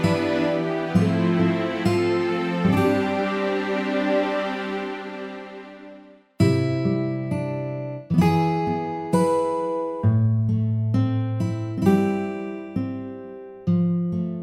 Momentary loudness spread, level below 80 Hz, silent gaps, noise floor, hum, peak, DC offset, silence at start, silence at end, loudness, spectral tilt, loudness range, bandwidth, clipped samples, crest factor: 11 LU; -54 dBFS; none; -47 dBFS; none; -6 dBFS; under 0.1%; 0 s; 0 s; -23 LUFS; -8 dB/octave; 4 LU; 14 kHz; under 0.1%; 18 dB